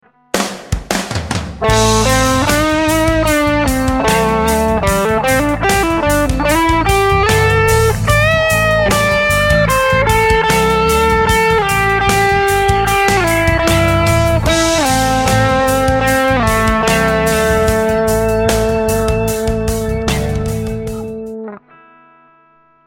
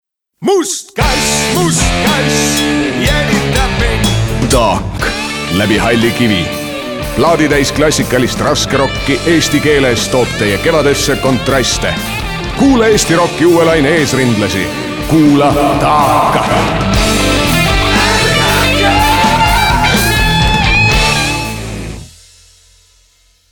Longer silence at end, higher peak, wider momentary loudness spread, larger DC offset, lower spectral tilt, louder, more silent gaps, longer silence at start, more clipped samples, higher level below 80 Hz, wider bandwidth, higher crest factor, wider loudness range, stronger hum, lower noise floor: second, 1.3 s vs 1.45 s; about the same, 0 dBFS vs 0 dBFS; about the same, 7 LU vs 7 LU; neither; about the same, -4.5 dB/octave vs -4 dB/octave; about the same, -13 LUFS vs -11 LUFS; neither; about the same, 0.35 s vs 0.4 s; neither; about the same, -24 dBFS vs -22 dBFS; second, 17 kHz vs 19.5 kHz; about the same, 14 dB vs 12 dB; about the same, 4 LU vs 3 LU; neither; about the same, -50 dBFS vs -51 dBFS